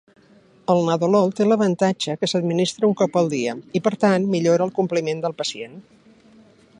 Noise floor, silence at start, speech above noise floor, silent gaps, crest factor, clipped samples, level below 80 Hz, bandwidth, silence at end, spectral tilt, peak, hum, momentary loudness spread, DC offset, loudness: -53 dBFS; 0.7 s; 33 dB; none; 16 dB; under 0.1%; -68 dBFS; 10.5 kHz; 1 s; -5.5 dB/octave; -4 dBFS; none; 7 LU; under 0.1%; -20 LUFS